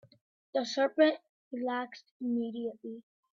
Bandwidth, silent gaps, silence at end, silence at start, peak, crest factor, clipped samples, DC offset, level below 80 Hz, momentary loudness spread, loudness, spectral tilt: 7.6 kHz; 1.29-1.51 s, 2.11-2.20 s; 0.35 s; 0.55 s; -12 dBFS; 22 dB; under 0.1%; under 0.1%; -84 dBFS; 18 LU; -32 LUFS; -4 dB/octave